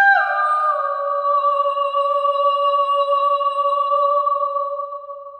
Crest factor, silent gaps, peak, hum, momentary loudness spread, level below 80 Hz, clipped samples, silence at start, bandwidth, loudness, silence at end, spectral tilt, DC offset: 14 dB; none; -4 dBFS; none; 5 LU; -76 dBFS; under 0.1%; 0 s; 9 kHz; -18 LUFS; 0 s; 1 dB/octave; under 0.1%